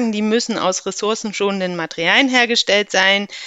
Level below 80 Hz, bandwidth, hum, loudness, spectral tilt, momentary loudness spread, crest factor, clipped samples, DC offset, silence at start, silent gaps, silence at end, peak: -62 dBFS; 9.2 kHz; none; -16 LUFS; -2.5 dB/octave; 8 LU; 18 dB; under 0.1%; under 0.1%; 0 s; none; 0 s; 0 dBFS